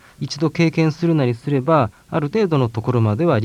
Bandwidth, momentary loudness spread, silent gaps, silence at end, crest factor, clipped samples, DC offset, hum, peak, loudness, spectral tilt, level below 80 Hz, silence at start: 10 kHz; 5 LU; none; 0 s; 16 dB; under 0.1%; under 0.1%; none; -2 dBFS; -19 LUFS; -7.5 dB/octave; -54 dBFS; 0.2 s